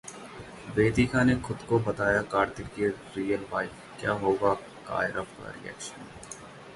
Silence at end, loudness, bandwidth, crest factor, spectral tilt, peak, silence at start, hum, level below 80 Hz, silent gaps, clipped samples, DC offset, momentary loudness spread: 0 s; -28 LUFS; 11.5 kHz; 20 dB; -6 dB/octave; -8 dBFS; 0.05 s; none; -50 dBFS; none; under 0.1%; under 0.1%; 18 LU